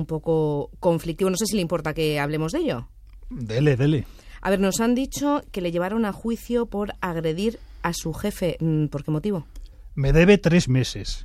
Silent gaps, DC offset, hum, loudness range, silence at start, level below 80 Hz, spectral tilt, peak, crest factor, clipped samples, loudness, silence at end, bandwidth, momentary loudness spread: none; under 0.1%; none; 4 LU; 0 s; -38 dBFS; -6 dB/octave; -4 dBFS; 20 dB; under 0.1%; -23 LUFS; 0 s; 15.5 kHz; 9 LU